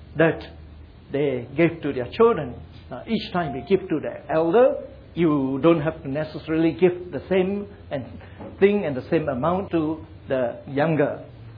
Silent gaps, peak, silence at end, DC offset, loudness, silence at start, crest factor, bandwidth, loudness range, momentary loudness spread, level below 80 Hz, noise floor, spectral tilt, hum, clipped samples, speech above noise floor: none; -4 dBFS; 0 s; under 0.1%; -23 LUFS; 0 s; 18 dB; 5.2 kHz; 3 LU; 14 LU; -50 dBFS; -43 dBFS; -10 dB/octave; none; under 0.1%; 21 dB